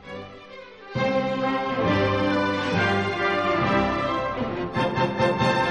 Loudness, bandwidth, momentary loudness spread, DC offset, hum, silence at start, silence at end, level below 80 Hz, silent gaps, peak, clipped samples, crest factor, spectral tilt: -23 LUFS; 10.5 kHz; 15 LU; 0.1%; none; 0 s; 0 s; -48 dBFS; none; -8 dBFS; under 0.1%; 14 dB; -6 dB/octave